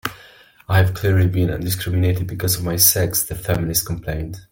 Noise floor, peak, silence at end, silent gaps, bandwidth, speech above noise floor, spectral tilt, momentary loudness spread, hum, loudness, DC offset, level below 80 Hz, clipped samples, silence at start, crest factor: -47 dBFS; 0 dBFS; 0.1 s; none; 17 kHz; 28 dB; -4 dB/octave; 12 LU; none; -19 LUFS; under 0.1%; -40 dBFS; under 0.1%; 0.05 s; 20 dB